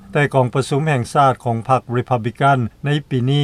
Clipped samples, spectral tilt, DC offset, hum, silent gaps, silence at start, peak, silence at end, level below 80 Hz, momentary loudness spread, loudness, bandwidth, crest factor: under 0.1%; -6.5 dB/octave; under 0.1%; none; none; 0.1 s; -2 dBFS; 0 s; -50 dBFS; 5 LU; -18 LUFS; 12 kHz; 16 dB